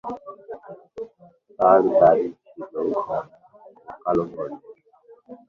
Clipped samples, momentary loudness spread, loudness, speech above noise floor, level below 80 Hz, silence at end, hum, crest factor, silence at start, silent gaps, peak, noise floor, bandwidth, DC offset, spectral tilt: under 0.1%; 24 LU; -21 LUFS; 34 dB; -62 dBFS; 0.15 s; none; 20 dB; 0.05 s; none; -4 dBFS; -53 dBFS; 6.2 kHz; under 0.1%; -9.5 dB/octave